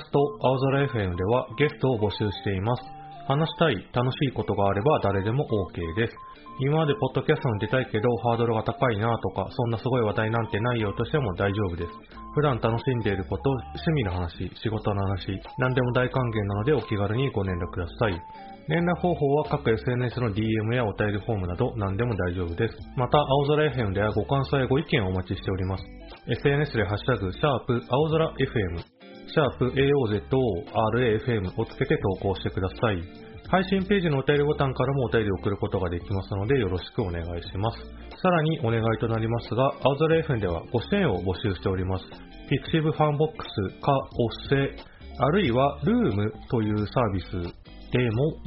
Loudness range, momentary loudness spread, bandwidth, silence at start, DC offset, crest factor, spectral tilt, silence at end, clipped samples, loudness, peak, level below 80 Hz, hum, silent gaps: 2 LU; 8 LU; 5.8 kHz; 0 s; under 0.1%; 20 dB; -6 dB/octave; 0 s; under 0.1%; -26 LUFS; -6 dBFS; -44 dBFS; none; none